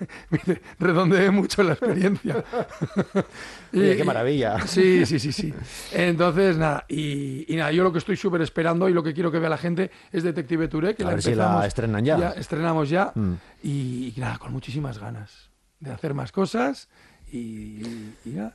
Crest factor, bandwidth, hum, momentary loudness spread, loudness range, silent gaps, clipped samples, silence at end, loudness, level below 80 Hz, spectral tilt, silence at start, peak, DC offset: 16 dB; 12.5 kHz; none; 15 LU; 8 LU; none; under 0.1%; 0.05 s; -23 LUFS; -50 dBFS; -6.5 dB/octave; 0 s; -6 dBFS; under 0.1%